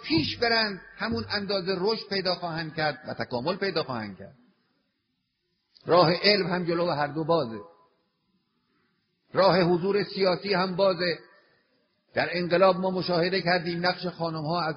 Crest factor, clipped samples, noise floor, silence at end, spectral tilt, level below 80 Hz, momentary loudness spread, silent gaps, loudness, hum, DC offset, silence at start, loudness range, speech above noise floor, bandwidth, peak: 22 dB; under 0.1%; -78 dBFS; 0 s; -3 dB/octave; -62 dBFS; 11 LU; none; -26 LUFS; none; under 0.1%; 0 s; 5 LU; 52 dB; 6.4 kHz; -4 dBFS